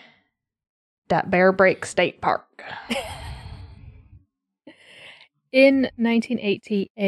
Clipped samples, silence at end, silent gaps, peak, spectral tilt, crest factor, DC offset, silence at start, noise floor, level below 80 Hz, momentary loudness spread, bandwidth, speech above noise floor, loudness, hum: under 0.1%; 0 s; 6.90-6.95 s; -4 dBFS; -5.5 dB/octave; 20 dB; under 0.1%; 1.1 s; -71 dBFS; -50 dBFS; 21 LU; 12.5 kHz; 50 dB; -21 LUFS; none